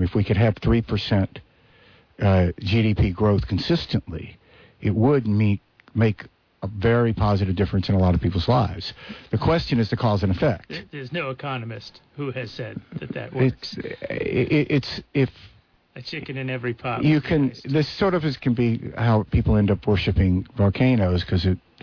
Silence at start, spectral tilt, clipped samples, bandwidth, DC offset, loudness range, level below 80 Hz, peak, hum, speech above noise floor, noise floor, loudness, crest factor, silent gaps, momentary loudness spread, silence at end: 0 s; -8.5 dB/octave; under 0.1%; 5.4 kHz; under 0.1%; 5 LU; -38 dBFS; -8 dBFS; none; 33 dB; -54 dBFS; -23 LUFS; 14 dB; none; 13 LU; 0.25 s